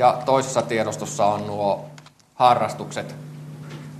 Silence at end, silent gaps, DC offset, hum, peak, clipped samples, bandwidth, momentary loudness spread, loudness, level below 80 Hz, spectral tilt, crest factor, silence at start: 0 s; none; under 0.1%; none; -2 dBFS; under 0.1%; 13 kHz; 19 LU; -22 LUFS; -64 dBFS; -4.5 dB/octave; 22 dB; 0 s